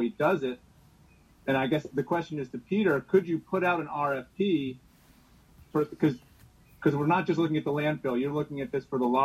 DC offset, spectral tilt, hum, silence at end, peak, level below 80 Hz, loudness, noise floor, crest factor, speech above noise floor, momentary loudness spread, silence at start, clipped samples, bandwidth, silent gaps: under 0.1%; -7.5 dB/octave; none; 0 s; -10 dBFS; -64 dBFS; -29 LUFS; -59 dBFS; 18 dB; 31 dB; 9 LU; 0 s; under 0.1%; 14 kHz; none